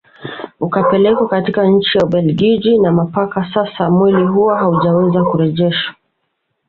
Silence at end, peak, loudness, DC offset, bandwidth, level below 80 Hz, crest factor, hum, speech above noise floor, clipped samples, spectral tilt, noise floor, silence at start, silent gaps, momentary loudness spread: 0.8 s; -2 dBFS; -13 LUFS; under 0.1%; 4.8 kHz; -50 dBFS; 12 dB; none; 56 dB; under 0.1%; -9 dB/octave; -69 dBFS; 0.2 s; none; 7 LU